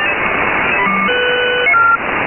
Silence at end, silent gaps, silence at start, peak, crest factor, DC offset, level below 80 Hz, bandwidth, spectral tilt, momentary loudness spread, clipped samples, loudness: 0 s; none; 0 s; -2 dBFS; 10 dB; under 0.1%; -42 dBFS; 3.3 kHz; -8 dB/octave; 4 LU; under 0.1%; -12 LUFS